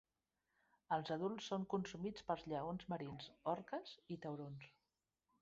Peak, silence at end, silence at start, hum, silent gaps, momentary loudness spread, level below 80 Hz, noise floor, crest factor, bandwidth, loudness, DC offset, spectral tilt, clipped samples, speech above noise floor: -26 dBFS; 0.7 s; 0.9 s; none; none; 9 LU; -76 dBFS; under -90 dBFS; 20 dB; 7.6 kHz; -46 LUFS; under 0.1%; -5 dB/octave; under 0.1%; over 45 dB